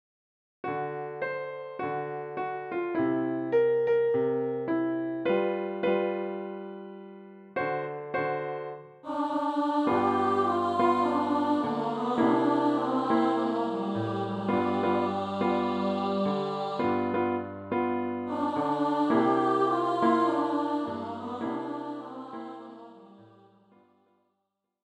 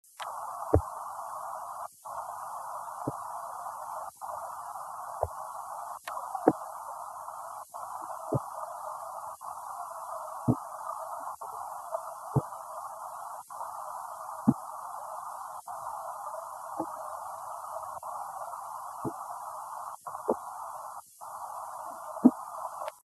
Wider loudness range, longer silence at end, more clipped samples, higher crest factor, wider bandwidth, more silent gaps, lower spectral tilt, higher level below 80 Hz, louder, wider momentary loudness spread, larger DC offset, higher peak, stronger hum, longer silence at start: first, 7 LU vs 4 LU; first, 1.6 s vs 0.05 s; neither; second, 18 dB vs 30 dB; second, 8.8 kHz vs 13 kHz; neither; about the same, -7.5 dB/octave vs -7 dB/octave; second, -74 dBFS vs -56 dBFS; first, -28 LUFS vs -36 LUFS; about the same, 13 LU vs 11 LU; neither; second, -12 dBFS vs -6 dBFS; neither; first, 0.65 s vs 0.05 s